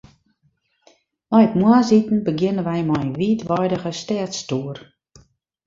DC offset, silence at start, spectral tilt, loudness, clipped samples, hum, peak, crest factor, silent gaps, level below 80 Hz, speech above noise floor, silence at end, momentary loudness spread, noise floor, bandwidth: under 0.1%; 1.3 s; -6.5 dB/octave; -19 LUFS; under 0.1%; none; -2 dBFS; 18 dB; none; -56 dBFS; 47 dB; 0.85 s; 11 LU; -66 dBFS; 7.6 kHz